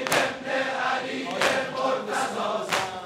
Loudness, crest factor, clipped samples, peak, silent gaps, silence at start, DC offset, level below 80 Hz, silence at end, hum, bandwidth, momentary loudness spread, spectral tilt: -26 LUFS; 24 dB; under 0.1%; -2 dBFS; none; 0 s; under 0.1%; -66 dBFS; 0 s; none; 16 kHz; 4 LU; -2.5 dB/octave